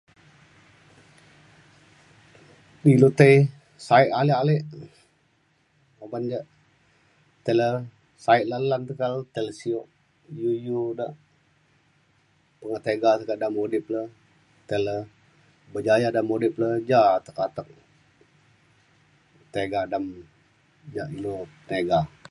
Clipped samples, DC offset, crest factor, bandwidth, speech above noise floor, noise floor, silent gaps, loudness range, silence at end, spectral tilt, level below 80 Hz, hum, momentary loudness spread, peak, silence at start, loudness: under 0.1%; under 0.1%; 24 dB; 11.5 kHz; 43 dB; -66 dBFS; none; 12 LU; 0.25 s; -7.5 dB/octave; -62 dBFS; none; 17 LU; 0 dBFS; 2.85 s; -24 LUFS